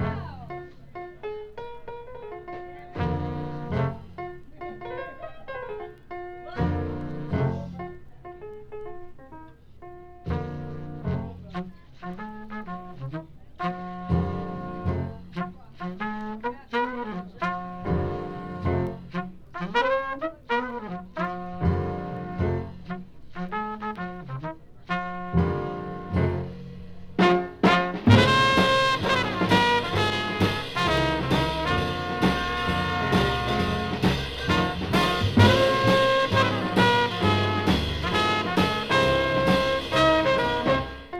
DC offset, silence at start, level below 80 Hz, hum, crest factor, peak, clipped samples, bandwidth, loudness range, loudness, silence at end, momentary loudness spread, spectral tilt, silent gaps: under 0.1%; 0 s; -42 dBFS; none; 24 dB; 0 dBFS; under 0.1%; 15 kHz; 14 LU; -25 LUFS; 0 s; 19 LU; -6 dB/octave; none